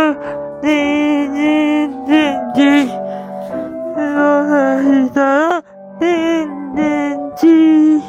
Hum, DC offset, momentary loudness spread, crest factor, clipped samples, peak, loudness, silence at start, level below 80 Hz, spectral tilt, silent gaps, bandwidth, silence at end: none; under 0.1%; 12 LU; 12 dB; under 0.1%; -2 dBFS; -14 LUFS; 0 s; -54 dBFS; -5.5 dB/octave; none; 8.2 kHz; 0 s